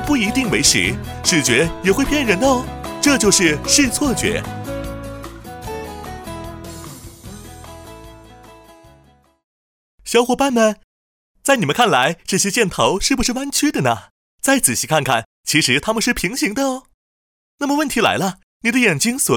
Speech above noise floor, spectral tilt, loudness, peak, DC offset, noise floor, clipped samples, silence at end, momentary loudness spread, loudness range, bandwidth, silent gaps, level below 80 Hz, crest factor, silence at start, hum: 36 dB; -3 dB/octave; -16 LUFS; 0 dBFS; under 0.1%; -52 dBFS; under 0.1%; 0 s; 19 LU; 17 LU; 19.5 kHz; 9.44-9.98 s, 10.84-11.34 s, 14.10-14.38 s, 15.25-15.44 s, 16.94-17.58 s, 18.43-18.60 s; -38 dBFS; 18 dB; 0 s; none